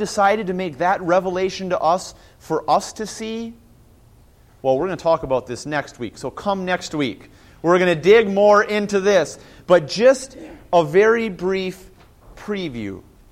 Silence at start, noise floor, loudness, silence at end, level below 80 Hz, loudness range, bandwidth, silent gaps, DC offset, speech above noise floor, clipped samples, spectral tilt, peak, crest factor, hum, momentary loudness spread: 0 s; -50 dBFS; -19 LUFS; 0.3 s; -50 dBFS; 8 LU; 15 kHz; none; under 0.1%; 31 dB; under 0.1%; -5 dB/octave; -2 dBFS; 18 dB; none; 16 LU